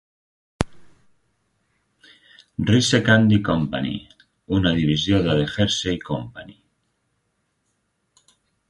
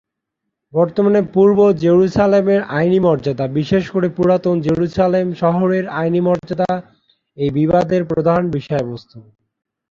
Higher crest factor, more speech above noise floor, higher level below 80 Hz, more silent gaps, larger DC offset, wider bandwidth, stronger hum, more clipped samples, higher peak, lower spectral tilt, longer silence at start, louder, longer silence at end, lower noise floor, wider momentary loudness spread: first, 22 dB vs 14 dB; second, 52 dB vs 62 dB; about the same, -44 dBFS vs -48 dBFS; neither; neither; first, 11.5 kHz vs 7.4 kHz; neither; neither; about the same, 0 dBFS vs -2 dBFS; second, -5.5 dB/octave vs -8.5 dB/octave; second, 0.6 s vs 0.75 s; second, -20 LUFS vs -16 LUFS; first, 2.2 s vs 0.7 s; second, -72 dBFS vs -78 dBFS; first, 13 LU vs 8 LU